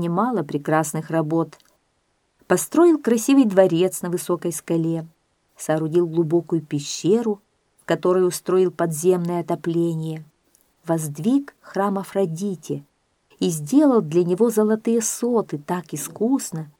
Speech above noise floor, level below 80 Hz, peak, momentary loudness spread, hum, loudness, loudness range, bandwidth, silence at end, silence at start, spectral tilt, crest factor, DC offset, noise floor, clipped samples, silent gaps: 48 dB; -70 dBFS; -2 dBFS; 11 LU; none; -21 LUFS; 5 LU; 17.5 kHz; 0.1 s; 0 s; -6 dB/octave; 20 dB; under 0.1%; -68 dBFS; under 0.1%; none